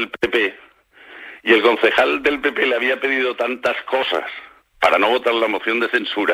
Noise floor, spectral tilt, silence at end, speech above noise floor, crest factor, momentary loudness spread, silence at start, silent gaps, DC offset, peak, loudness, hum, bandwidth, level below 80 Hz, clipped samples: -44 dBFS; -3.5 dB/octave; 0 s; 26 dB; 18 dB; 9 LU; 0 s; none; under 0.1%; -2 dBFS; -18 LUFS; none; 16 kHz; -56 dBFS; under 0.1%